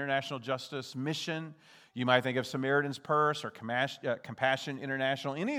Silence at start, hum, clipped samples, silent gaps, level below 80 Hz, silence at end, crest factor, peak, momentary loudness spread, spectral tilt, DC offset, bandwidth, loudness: 0 s; none; under 0.1%; none; -84 dBFS; 0 s; 24 dB; -10 dBFS; 9 LU; -5 dB/octave; under 0.1%; 16 kHz; -32 LUFS